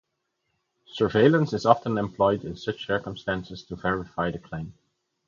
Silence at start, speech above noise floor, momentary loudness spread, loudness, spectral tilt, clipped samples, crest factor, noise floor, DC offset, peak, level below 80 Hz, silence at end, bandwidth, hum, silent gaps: 0.95 s; 53 dB; 17 LU; -25 LUFS; -7 dB/octave; under 0.1%; 24 dB; -78 dBFS; under 0.1%; -2 dBFS; -54 dBFS; 0.55 s; 7.4 kHz; none; none